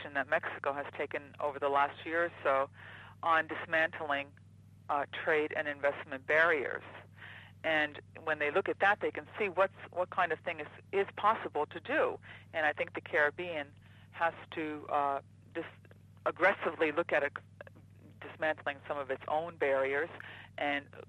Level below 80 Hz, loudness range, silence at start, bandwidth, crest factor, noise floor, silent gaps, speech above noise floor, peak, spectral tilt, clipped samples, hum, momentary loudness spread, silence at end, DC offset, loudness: -76 dBFS; 3 LU; 0 s; 10.5 kHz; 20 dB; -56 dBFS; none; 22 dB; -14 dBFS; -5.5 dB/octave; under 0.1%; none; 16 LU; 0.05 s; under 0.1%; -33 LUFS